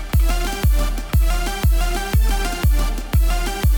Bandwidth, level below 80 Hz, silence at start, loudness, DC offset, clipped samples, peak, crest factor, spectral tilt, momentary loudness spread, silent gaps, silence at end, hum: over 20 kHz; -18 dBFS; 0 s; -20 LUFS; under 0.1%; under 0.1%; -8 dBFS; 10 dB; -5 dB/octave; 2 LU; none; 0 s; none